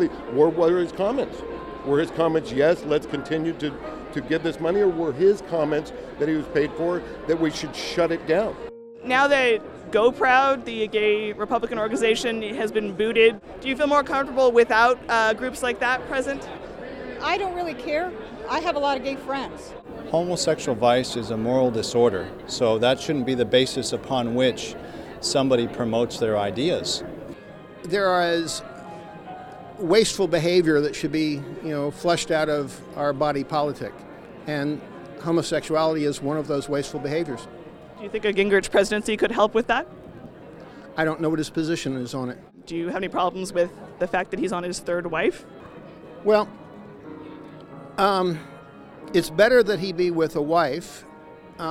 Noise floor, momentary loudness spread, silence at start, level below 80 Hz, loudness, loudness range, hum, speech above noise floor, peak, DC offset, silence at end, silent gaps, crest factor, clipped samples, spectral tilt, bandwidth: -44 dBFS; 19 LU; 0 s; -52 dBFS; -23 LUFS; 6 LU; none; 22 dB; -4 dBFS; under 0.1%; 0 s; none; 20 dB; under 0.1%; -4.5 dB/octave; 14.5 kHz